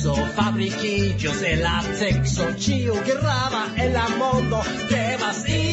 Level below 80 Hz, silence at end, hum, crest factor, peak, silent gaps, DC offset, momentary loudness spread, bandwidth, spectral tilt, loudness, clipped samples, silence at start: -36 dBFS; 0 s; none; 14 dB; -8 dBFS; none; under 0.1%; 2 LU; 8.2 kHz; -5 dB/octave; -22 LUFS; under 0.1%; 0 s